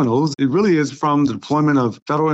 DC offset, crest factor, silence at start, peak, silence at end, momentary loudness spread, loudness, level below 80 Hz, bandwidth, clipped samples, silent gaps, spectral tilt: under 0.1%; 10 dB; 0 s; -8 dBFS; 0 s; 3 LU; -18 LUFS; -58 dBFS; 8.2 kHz; under 0.1%; 2.02-2.06 s; -7 dB/octave